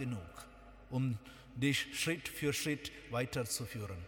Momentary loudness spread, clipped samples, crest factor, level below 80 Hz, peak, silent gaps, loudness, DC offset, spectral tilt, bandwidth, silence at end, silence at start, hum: 17 LU; under 0.1%; 18 dB; -60 dBFS; -22 dBFS; none; -38 LUFS; under 0.1%; -4 dB/octave; 19 kHz; 0 s; 0 s; none